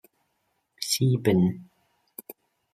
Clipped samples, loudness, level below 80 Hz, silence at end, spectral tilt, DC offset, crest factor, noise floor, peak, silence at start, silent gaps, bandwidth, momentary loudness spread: under 0.1%; -24 LUFS; -64 dBFS; 1.1 s; -5.5 dB/octave; under 0.1%; 20 dB; -75 dBFS; -8 dBFS; 0.8 s; none; 15.5 kHz; 22 LU